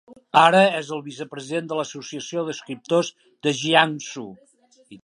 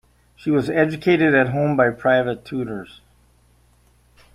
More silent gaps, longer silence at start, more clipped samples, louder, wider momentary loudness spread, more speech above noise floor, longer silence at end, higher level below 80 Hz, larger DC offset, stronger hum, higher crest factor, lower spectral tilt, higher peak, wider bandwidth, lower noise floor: neither; second, 0.1 s vs 0.45 s; neither; about the same, -21 LUFS vs -19 LUFS; first, 18 LU vs 13 LU; second, 27 dB vs 38 dB; second, 0.05 s vs 1.5 s; second, -74 dBFS vs -54 dBFS; neither; neither; about the same, 22 dB vs 18 dB; second, -4 dB/octave vs -7.5 dB/octave; about the same, 0 dBFS vs -2 dBFS; second, 11.5 kHz vs 13 kHz; second, -49 dBFS vs -57 dBFS